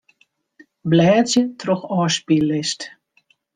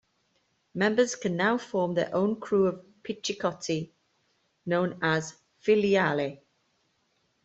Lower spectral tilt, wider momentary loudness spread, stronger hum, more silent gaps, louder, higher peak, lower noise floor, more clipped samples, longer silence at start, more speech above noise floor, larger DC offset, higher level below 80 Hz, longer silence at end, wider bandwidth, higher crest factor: about the same, -5 dB/octave vs -5 dB/octave; about the same, 14 LU vs 13 LU; neither; neither; first, -18 LUFS vs -27 LUFS; first, -4 dBFS vs -10 dBFS; second, -62 dBFS vs -73 dBFS; neither; about the same, 0.85 s vs 0.75 s; about the same, 44 dB vs 46 dB; neither; first, -60 dBFS vs -68 dBFS; second, 0.65 s vs 1.1 s; first, 9.8 kHz vs 8.2 kHz; about the same, 16 dB vs 18 dB